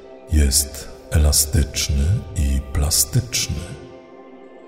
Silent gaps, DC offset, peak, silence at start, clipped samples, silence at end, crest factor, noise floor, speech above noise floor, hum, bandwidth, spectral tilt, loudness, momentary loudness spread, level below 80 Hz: none; under 0.1%; -2 dBFS; 0 s; under 0.1%; 0 s; 18 dB; -42 dBFS; 22 dB; none; 16.5 kHz; -3.5 dB/octave; -19 LUFS; 11 LU; -24 dBFS